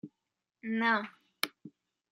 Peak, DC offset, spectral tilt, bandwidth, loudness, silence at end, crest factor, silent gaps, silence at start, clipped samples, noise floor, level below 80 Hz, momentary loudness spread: -8 dBFS; under 0.1%; -3.5 dB/octave; 16 kHz; -33 LUFS; 0.45 s; 28 dB; none; 0.05 s; under 0.1%; -87 dBFS; -86 dBFS; 17 LU